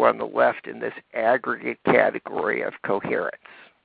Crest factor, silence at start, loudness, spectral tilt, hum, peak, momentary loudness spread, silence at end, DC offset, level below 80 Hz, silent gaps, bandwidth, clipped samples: 22 dB; 0 s; -24 LUFS; -10 dB/octave; none; -2 dBFS; 11 LU; 0.5 s; under 0.1%; -68 dBFS; none; 4.9 kHz; under 0.1%